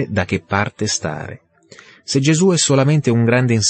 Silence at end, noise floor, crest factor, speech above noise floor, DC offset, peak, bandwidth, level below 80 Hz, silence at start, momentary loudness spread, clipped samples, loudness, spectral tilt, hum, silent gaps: 0 s; -45 dBFS; 14 dB; 29 dB; under 0.1%; -2 dBFS; 8.8 kHz; -52 dBFS; 0 s; 13 LU; under 0.1%; -16 LUFS; -4.5 dB/octave; none; none